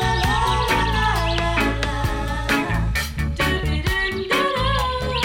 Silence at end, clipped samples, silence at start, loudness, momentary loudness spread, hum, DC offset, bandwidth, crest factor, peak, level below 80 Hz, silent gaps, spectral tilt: 0 s; under 0.1%; 0 s; -21 LUFS; 4 LU; none; under 0.1%; 17.5 kHz; 12 dB; -8 dBFS; -26 dBFS; none; -4.5 dB/octave